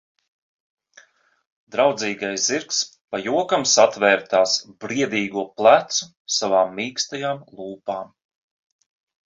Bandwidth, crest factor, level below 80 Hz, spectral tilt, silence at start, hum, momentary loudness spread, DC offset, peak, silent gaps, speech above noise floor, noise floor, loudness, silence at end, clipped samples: 8 kHz; 22 dB; -68 dBFS; -2 dB/octave; 1.75 s; none; 14 LU; under 0.1%; -2 dBFS; 3.01-3.08 s, 6.17-6.25 s; 34 dB; -55 dBFS; -20 LUFS; 1.2 s; under 0.1%